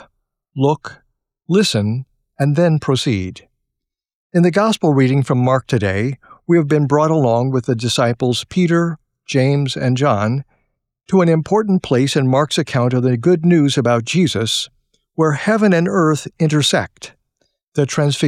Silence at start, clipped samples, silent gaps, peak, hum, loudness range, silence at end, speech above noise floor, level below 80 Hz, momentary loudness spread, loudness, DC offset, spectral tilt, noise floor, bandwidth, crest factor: 0.55 s; under 0.1%; 4.15-4.30 s, 17.63-17.72 s; -4 dBFS; none; 3 LU; 0 s; 65 dB; -54 dBFS; 9 LU; -16 LUFS; under 0.1%; -6 dB/octave; -80 dBFS; 14.5 kHz; 14 dB